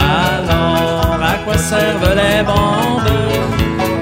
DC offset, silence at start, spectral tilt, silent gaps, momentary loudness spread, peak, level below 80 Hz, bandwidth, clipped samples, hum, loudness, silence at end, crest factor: under 0.1%; 0 s; -5 dB/octave; none; 3 LU; 0 dBFS; -26 dBFS; 16.5 kHz; under 0.1%; none; -14 LUFS; 0 s; 14 dB